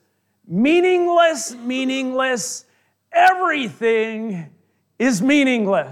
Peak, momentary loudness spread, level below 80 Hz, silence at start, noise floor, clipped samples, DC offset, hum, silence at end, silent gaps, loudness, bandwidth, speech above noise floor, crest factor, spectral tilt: -4 dBFS; 12 LU; -68 dBFS; 0.5 s; -53 dBFS; under 0.1%; under 0.1%; none; 0 s; none; -18 LUFS; 14.5 kHz; 35 dB; 16 dB; -4 dB/octave